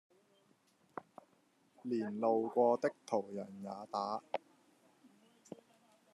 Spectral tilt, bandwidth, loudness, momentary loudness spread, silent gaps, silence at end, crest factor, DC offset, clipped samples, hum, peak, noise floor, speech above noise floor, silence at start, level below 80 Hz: -6.5 dB/octave; 11.5 kHz; -37 LUFS; 22 LU; none; 1.75 s; 22 dB; under 0.1%; under 0.1%; none; -18 dBFS; -73 dBFS; 36 dB; 0.95 s; under -90 dBFS